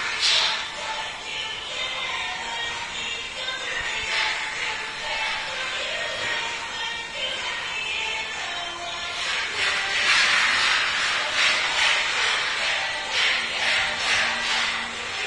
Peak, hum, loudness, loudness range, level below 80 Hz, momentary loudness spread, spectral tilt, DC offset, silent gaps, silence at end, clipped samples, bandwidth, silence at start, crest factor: -6 dBFS; none; -23 LUFS; 7 LU; -54 dBFS; 10 LU; 0.5 dB/octave; under 0.1%; none; 0 s; under 0.1%; 11 kHz; 0 s; 20 dB